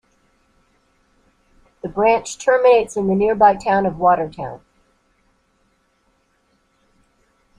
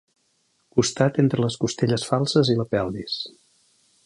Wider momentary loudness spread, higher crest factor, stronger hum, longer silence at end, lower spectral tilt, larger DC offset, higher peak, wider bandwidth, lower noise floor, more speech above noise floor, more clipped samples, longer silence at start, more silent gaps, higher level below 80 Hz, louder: first, 18 LU vs 9 LU; about the same, 18 dB vs 20 dB; neither; first, 3 s vs 0.75 s; about the same, -5.5 dB/octave vs -5.5 dB/octave; neither; about the same, -2 dBFS vs -4 dBFS; about the same, 11 kHz vs 11.5 kHz; second, -63 dBFS vs -68 dBFS; about the same, 47 dB vs 46 dB; neither; first, 1.85 s vs 0.75 s; neither; about the same, -52 dBFS vs -56 dBFS; first, -17 LUFS vs -23 LUFS